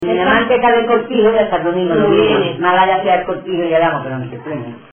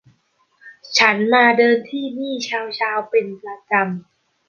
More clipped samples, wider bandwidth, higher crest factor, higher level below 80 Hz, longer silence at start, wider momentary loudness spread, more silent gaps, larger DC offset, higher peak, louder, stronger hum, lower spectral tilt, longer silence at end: neither; second, 3.5 kHz vs 7.2 kHz; about the same, 14 dB vs 18 dB; first, -46 dBFS vs -68 dBFS; second, 0 s vs 0.65 s; about the same, 13 LU vs 13 LU; neither; neither; about the same, 0 dBFS vs -2 dBFS; first, -14 LUFS vs -17 LUFS; neither; first, -9 dB/octave vs -3.5 dB/octave; second, 0.15 s vs 0.5 s